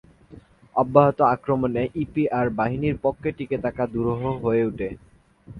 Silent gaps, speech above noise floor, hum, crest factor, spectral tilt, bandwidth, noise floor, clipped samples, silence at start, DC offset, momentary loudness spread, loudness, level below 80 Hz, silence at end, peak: none; 26 dB; none; 22 dB; -10 dB/octave; 5.2 kHz; -48 dBFS; under 0.1%; 0.3 s; under 0.1%; 10 LU; -23 LUFS; -48 dBFS; 0 s; 0 dBFS